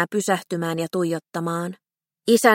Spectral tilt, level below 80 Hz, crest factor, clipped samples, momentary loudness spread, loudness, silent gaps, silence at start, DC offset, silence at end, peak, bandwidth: -4.5 dB/octave; -72 dBFS; 20 dB; under 0.1%; 10 LU; -24 LUFS; none; 0 s; under 0.1%; 0 s; -2 dBFS; 16.5 kHz